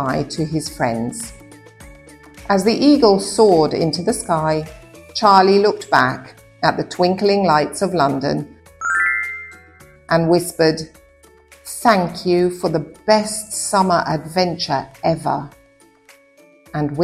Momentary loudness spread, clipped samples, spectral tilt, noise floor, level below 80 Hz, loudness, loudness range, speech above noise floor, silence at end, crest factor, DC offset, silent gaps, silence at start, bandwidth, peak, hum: 14 LU; under 0.1%; -5 dB/octave; -51 dBFS; -48 dBFS; -17 LUFS; 4 LU; 35 dB; 0 s; 18 dB; under 0.1%; none; 0 s; 15.5 kHz; 0 dBFS; none